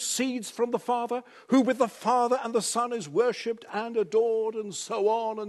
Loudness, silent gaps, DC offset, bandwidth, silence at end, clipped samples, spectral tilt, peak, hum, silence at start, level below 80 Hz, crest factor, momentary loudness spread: -27 LUFS; none; under 0.1%; 12.5 kHz; 0 s; under 0.1%; -3.5 dB/octave; -10 dBFS; none; 0 s; -82 dBFS; 18 dB; 8 LU